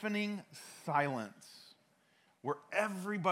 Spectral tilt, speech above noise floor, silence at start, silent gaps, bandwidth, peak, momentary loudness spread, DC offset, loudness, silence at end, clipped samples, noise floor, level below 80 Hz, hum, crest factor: -5.5 dB/octave; 34 dB; 0 s; none; 16 kHz; -16 dBFS; 19 LU; under 0.1%; -38 LUFS; 0 s; under 0.1%; -72 dBFS; under -90 dBFS; none; 22 dB